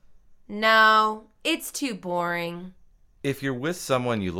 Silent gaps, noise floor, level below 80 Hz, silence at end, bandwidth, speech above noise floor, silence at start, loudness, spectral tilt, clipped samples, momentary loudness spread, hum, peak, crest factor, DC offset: none; -50 dBFS; -58 dBFS; 0 s; 17 kHz; 26 dB; 0.1 s; -24 LUFS; -4 dB/octave; under 0.1%; 15 LU; none; -6 dBFS; 20 dB; under 0.1%